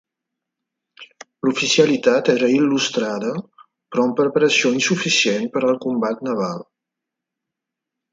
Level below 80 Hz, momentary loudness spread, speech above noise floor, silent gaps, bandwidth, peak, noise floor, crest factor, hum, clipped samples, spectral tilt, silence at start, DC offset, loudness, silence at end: -68 dBFS; 9 LU; 65 dB; none; 9.4 kHz; -2 dBFS; -84 dBFS; 18 dB; none; under 0.1%; -3.5 dB/octave; 1 s; under 0.1%; -18 LUFS; 1.5 s